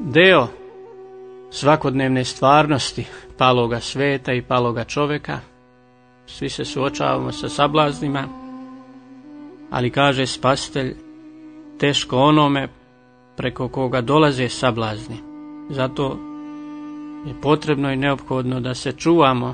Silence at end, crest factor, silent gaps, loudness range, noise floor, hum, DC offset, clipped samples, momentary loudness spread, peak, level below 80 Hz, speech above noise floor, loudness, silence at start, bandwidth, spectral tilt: 0 s; 20 dB; none; 5 LU; -52 dBFS; none; under 0.1%; under 0.1%; 21 LU; 0 dBFS; -48 dBFS; 33 dB; -19 LUFS; 0 s; 9.6 kHz; -5.5 dB/octave